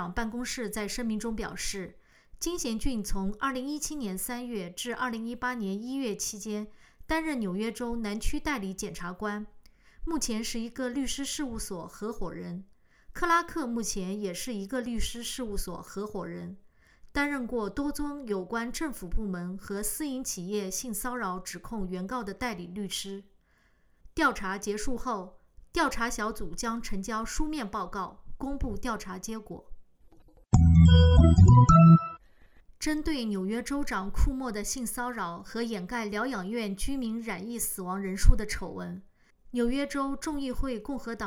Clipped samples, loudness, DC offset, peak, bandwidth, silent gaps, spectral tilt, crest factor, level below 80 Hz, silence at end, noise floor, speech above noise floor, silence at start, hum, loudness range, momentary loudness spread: under 0.1%; -29 LUFS; under 0.1%; -4 dBFS; 17.5 kHz; none; -5.5 dB/octave; 24 dB; -38 dBFS; 0 s; -65 dBFS; 36 dB; 0 s; none; 13 LU; 11 LU